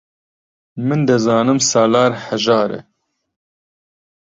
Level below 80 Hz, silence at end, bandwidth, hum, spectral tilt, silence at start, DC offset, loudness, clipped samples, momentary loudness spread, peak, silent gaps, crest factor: -58 dBFS; 1.4 s; 7.8 kHz; none; -4.5 dB/octave; 0.75 s; under 0.1%; -15 LUFS; under 0.1%; 11 LU; -2 dBFS; none; 16 dB